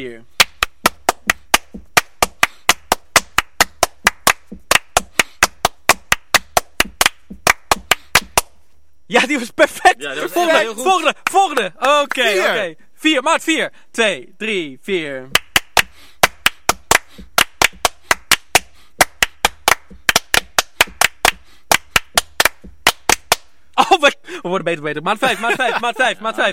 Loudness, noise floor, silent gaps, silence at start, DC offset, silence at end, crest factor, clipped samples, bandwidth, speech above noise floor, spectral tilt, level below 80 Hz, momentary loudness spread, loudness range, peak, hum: -16 LUFS; -59 dBFS; none; 0 s; 1%; 0 s; 18 dB; under 0.1%; over 20 kHz; 42 dB; -1 dB/octave; -40 dBFS; 6 LU; 2 LU; 0 dBFS; none